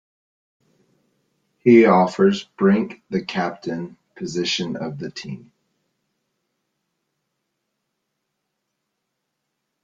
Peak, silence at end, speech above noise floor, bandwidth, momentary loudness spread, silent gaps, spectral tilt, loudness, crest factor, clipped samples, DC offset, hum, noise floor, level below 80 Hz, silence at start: -2 dBFS; 4.45 s; 59 dB; 7.8 kHz; 20 LU; none; -6 dB/octave; -19 LUFS; 22 dB; under 0.1%; under 0.1%; none; -78 dBFS; -64 dBFS; 1.65 s